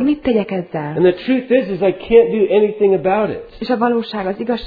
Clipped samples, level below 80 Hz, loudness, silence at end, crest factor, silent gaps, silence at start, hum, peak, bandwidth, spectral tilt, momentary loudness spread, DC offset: under 0.1%; -46 dBFS; -16 LUFS; 0 s; 16 dB; none; 0 s; none; 0 dBFS; 5 kHz; -9.5 dB/octave; 10 LU; under 0.1%